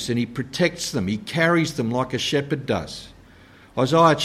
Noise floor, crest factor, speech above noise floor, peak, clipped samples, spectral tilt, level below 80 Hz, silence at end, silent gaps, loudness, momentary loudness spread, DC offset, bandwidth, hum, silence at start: -49 dBFS; 18 dB; 27 dB; -4 dBFS; under 0.1%; -5 dB/octave; -52 dBFS; 0 s; none; -22 LUFS; 9 LU; under 0.1%; 15 kHz; none; 0 s